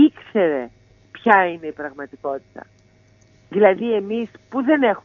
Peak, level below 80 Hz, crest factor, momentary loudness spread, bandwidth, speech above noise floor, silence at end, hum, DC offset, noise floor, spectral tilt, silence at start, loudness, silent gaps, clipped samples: 0 dBFS; -64 dBFS; 20 dB; 15 LU; 6.2 kHz; 35 dB; 0.05 s; none; under 0.1%; -54 dBFS; -7.5 dB/octave; 0 s; -20 LUFS; none; under 0.1%